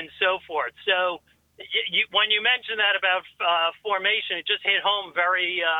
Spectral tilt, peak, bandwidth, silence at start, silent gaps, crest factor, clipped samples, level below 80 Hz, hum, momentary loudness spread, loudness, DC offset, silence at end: -3 dB/octave; -8 dBFS; 7.2 kHz; 0 s; none; 18 dB; under 0.1%; -70 dBFS; none; 7 LU; -22 LUFS; under 0.1%; 0 s